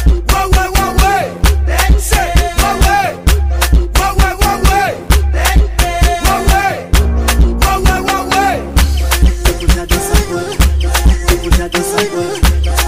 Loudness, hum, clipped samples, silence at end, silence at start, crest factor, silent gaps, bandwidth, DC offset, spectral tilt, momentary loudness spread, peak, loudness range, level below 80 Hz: -12 LUFS; none; under 0.1%; 0 s; 0 s; 10 dB; none; 16 kHz; under 0.1%; -4.5 dB/octave; 3 LU; 0 dBFS; 1 LU; -12 dBFS